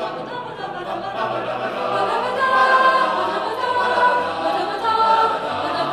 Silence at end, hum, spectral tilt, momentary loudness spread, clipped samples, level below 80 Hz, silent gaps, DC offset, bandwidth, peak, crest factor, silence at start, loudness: 0 s; none; -4 dB/octave; 13 LU; under 0.1%; -60 dBFS; none; under 0.1%; 13 kHz; -4 dBFS; 16 dB; 0 s; -19 LUFS